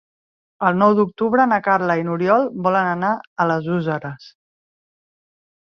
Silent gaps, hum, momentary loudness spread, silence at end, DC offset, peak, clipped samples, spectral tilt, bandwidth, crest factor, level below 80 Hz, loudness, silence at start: 3.27-3.36 s; none; 7 LU; 1.4 s; under 0.1%; -2 dBFS; under 0.1%; -8.5 dB/octave; 6.8 kHz; 18 dB; -64 dBFS; -18 LUFS; 0.6 s